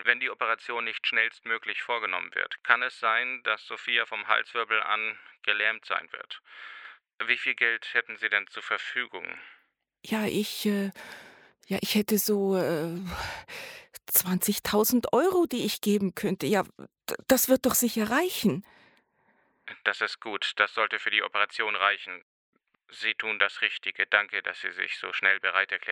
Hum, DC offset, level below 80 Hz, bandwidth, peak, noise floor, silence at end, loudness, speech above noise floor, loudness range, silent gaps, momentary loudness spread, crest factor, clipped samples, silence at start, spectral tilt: none; under 0.1%; -62 dBFS; over 20 kHz; -4 dBFS; -68 dBFS; 0 s; -27 LUFS; 40 dB; 4 LU; 22.22-22.53 s; 14 LU; 26 dB; under 0.1%; 0 s; -3 dB/octave